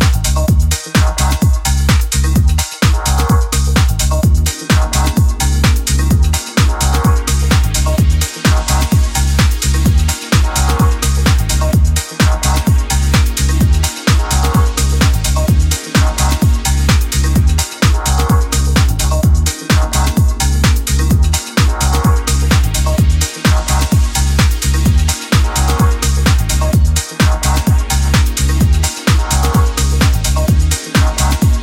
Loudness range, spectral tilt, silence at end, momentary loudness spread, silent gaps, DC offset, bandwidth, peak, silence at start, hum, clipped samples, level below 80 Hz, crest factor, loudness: 0 LU; -4.5 dB/octave; 0 s; 2 LU; none; under 0.1%; 17 kHz; 0 dBFS; 0 s; none; under 0.1%; -14 dBFS; 12 dB; -13 LUFS